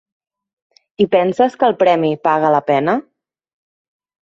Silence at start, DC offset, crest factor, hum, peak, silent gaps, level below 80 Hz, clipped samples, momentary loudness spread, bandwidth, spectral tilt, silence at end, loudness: 1 s; under 0.1%; 16 dB; none; 0 dBFS; none; -62 dBFS; under 0.1%; 5 LU; 7.8 kHz; -7 dB/octave; 1.2 s; -15 LUFS